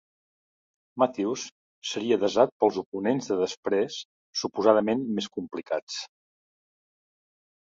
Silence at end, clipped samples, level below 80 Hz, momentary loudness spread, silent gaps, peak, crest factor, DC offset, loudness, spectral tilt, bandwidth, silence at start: 1.6 s; under 0.1%; -72 dBFS; 14 LU; 1.52-1.82 s, 2.52-2.60 s, 2.86-2.92 s, 3.57-3.63 s, 4.05-4.33 s, 5.82-5.87 s; -6 dBFS; 24 dB; under 0.1%; -27 LUFS; -4.5 dB/octave; 7.8 kHz; 0.95 s